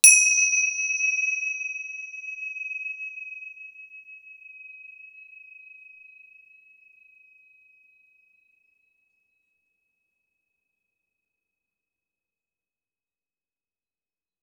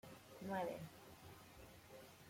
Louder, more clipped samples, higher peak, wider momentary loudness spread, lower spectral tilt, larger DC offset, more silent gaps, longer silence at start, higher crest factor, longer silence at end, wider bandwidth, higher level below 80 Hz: first, -22 LUFS vs -52 LUFS; neither; first, 0 dBFS vs -32 dBFS; first, 26 LU vs 15 LU; second, 8.5 dB/octave vs -5.5 dB/octave; neither; neither; about the same, 0.05 s vs 0.05 s; first, 30 dB vs 20 dB; first, 9.25 s vs 0 s; first, over 20 kHz vs 16.5 kHz; second, under -90 dBFS vs -76 dBFS